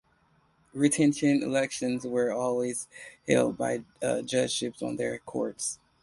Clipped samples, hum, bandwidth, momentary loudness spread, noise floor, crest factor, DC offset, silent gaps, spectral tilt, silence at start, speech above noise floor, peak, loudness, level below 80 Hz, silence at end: under 0.1%; none; 11.5 kHz; 10 LU; -66 dBFS; 22 dB; under 0.1%; none; -4.5 dB/octave; 0.75 s; 38 dB; -8 dBFS; -28 LUFS; -66 dBFS; 0.3 s